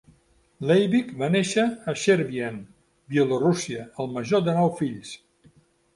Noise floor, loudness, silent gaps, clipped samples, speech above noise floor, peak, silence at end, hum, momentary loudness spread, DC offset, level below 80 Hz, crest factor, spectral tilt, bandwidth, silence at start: -61 dBFS; -24 LUFS; none; under 0.1%; 38 dB; -6 dBFS; 0.8 s; none; 12 LU; under 0.1%; -64 dBFS; 18 dB; -5.5 dB/octave; 11.5 kHz; 0.6 s